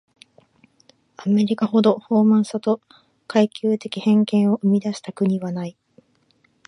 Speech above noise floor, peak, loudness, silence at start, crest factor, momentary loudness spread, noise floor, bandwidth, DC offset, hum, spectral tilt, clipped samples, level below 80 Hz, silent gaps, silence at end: 43 dB; -4 dBFS; -20 LUFS; 1.2 s; 18 dB; 10 LU; -62 dBFS; 10.5 kHz; under 0.1%; none; -7.5 dB/octave; under 0.1%; -70 dBFS; none; 0.95 s